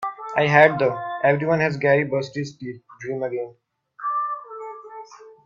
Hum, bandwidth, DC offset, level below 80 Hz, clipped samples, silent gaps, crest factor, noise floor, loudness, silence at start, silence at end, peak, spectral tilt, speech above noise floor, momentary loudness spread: none; 7.6 kHz; under 0.1%; -64 dBFS; under 0.1%; none; 22 dB; -42 dBFS; -21 LUFS; 0 s; 0.15 s; 0 dBFS; -6.5 dB/octave; 22 dB; 21 LU